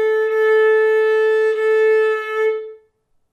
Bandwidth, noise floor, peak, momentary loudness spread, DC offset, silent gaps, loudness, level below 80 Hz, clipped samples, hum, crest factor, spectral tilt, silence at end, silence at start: 6 kHz; -62 dBFS; -6 dBFS; 7 LU; under 0.1%; none; -16 LUFS; -72 dBFS; under 0.1%; none; 10 dB; -1.5 dB/octave; 0.55 s; 0 s